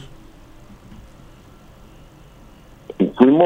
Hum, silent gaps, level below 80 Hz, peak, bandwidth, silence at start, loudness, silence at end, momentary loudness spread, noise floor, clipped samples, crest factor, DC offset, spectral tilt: none; none; -48 dBFS; 0 dBFS; 7.6 kHz; 3 s; -17 LUFS; 0 s; 30 LU; -45 dBFS; under 0.1%; 20 dB; under 0.1%; -8.5 dB/octave